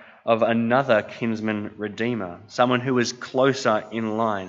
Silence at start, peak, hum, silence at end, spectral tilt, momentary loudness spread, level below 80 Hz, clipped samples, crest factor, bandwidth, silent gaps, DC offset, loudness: 0 s; -4 dBFS; none; 0 s; -5.5 dB/octave; 8 LU; -68 dBFS; under 0.1%; 20 dB; 7.8 kHz; none; under 0.1%; -23 LUFS